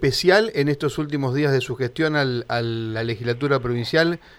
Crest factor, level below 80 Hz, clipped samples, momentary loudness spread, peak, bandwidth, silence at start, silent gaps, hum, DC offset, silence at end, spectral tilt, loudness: 18 dB; -50 dBFS; under 0.1%; 8 LU; -2 dBFS; 16 kHz; 0 s; none; none; under 0.1%; 0.2 s; -6 dB/octave; -22 LUFS